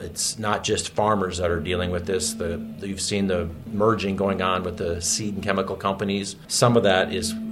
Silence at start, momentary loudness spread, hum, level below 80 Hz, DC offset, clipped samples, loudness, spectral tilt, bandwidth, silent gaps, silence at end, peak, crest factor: 0 s; 8 LU; none; -52 dBFS; under 0.1%; under 0.1%; -24 LUFS; -4 dB/octave; 16 kHz; none; 0 s; -4 dBFS; 20 dB